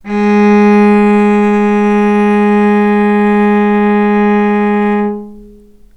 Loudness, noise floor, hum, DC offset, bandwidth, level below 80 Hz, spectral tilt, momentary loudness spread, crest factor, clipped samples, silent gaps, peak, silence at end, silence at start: -10 LUFS; -38 dBFS; none; under 0.1%; 7.8 kHz; -44 dBFS; -8.5 dB/octave; 4 LU; 10 dB; under 0.1%; none; 0 dBFS; 0.5 s; 0.05 s